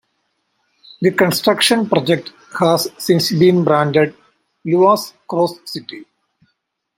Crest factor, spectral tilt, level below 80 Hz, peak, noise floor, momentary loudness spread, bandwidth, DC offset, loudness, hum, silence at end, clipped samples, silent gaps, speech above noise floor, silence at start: 16 dB; -5 dB/octave; -60 dBFS; -2 dBFS; -70 dBFS; 16 LU; 16.5 kHz; under 0.1%; -15 LUFS; none; 0.95 s; under 0.1%; none; 55 dB; 1 s